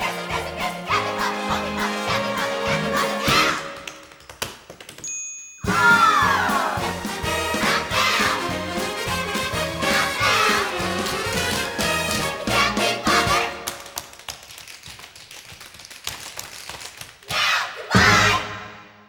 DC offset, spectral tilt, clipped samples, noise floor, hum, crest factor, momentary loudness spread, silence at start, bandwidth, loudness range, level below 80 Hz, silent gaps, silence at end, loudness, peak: under 0.1%; -3 dB/octave; under 0.1%; -43 dBFS; none; 20 dB; 20 LU; 0 s; over 20 kHz; 8 LU; -44 dBFS; none; 0.15 s; -21 LUFS; -2 dBFS